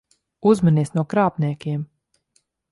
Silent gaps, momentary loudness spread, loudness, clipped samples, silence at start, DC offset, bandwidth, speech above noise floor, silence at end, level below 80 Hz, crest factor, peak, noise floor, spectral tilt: none; 11 LU; -20 LUFS; under 0.1%; 0.45 s; under 0.1%; 11.5 kHz; 48 dB; 0.85 s; -60 dBFS; 18 dB; -4 dBFS; -67 dBFS; -8.5 dB/octave